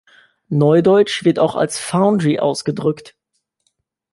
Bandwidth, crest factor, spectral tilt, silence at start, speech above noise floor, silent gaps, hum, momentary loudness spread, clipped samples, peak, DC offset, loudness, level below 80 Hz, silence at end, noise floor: 11.5 kHz; 14 dB; -6 dB/octave; 0.5 s; 54 dB; none; none; 9 LU; under 0.1%; -2 dBFS; under 0.1%; -16 LUFS; -60 dBFS; 1.05 s; -69 dBFS